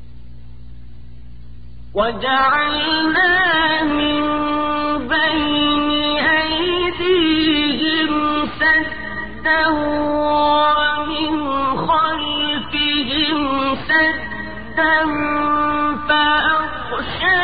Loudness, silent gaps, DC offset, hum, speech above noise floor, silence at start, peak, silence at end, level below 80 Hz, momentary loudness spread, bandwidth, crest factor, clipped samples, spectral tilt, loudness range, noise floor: -17 LUFS; none; 2%; 60 Hz at -45 dBFS; 22 dB; 0 s; -4 dBFS; 0 s; -40 dBFS; 6 LU; 4.9 kHz; 14 dB; under 0.1%; -9 dB/octave; 2 LU; -39 dBFS